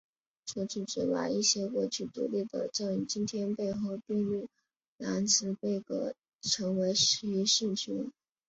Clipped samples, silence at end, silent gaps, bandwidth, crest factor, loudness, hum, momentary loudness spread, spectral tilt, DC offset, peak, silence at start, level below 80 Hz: under 0.1%; 0.35 s; 4.88-4.96 s, 6.35-6.39 s; 8 kHz; 20 dB; -31 LUFS; none; 11 LU; -3.5 dB/octave; under 0.1%; -14 dBFS; 0.45 s; -70 dBFS